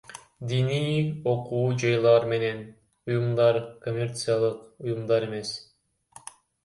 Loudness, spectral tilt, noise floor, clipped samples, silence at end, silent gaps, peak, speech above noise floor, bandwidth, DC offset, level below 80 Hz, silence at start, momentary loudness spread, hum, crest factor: -26 LUFS; -6 dB/octave; -54 dBFS; under 0.1%; 1 s; none; -8 dBFS; 29 dB; 11.5 kHz; under 0.1%; -64 dBFS; 0.1 s; 19 LU; none; 18 dB